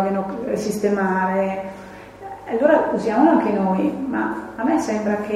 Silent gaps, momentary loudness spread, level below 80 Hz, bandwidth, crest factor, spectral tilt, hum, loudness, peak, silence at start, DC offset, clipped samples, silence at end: none; 18 LU; -54 dBFS; 13 kHz; 18 dB; -6.5 dB/octave; none; -20 LUFS; -2 dBFS; 0 s; under 0.1%; under 0.1%; 0 s